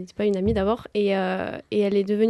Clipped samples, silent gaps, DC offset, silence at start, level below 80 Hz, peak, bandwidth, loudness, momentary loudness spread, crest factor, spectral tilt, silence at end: under 0.1%; none; under 0.1%; 0 s; -44 dBFS; -10 dBFS; 11 kHz; -24 LUFS; 5 LU; 14 dB; -7.5 dB/octave; 0 s